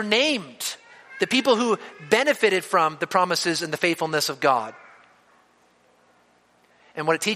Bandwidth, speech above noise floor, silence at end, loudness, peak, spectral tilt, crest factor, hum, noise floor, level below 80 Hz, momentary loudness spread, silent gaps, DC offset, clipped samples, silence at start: 15 kHz; 38 dB; 0 s; -22 LUFS; -2 dBFS; -3 dB/octave; 22 dB; 60 Hz at -55 dBFS; -60 dBFS; -74 dBFS; 11 LU; none; under 0.1%; under 0.1%; 0 s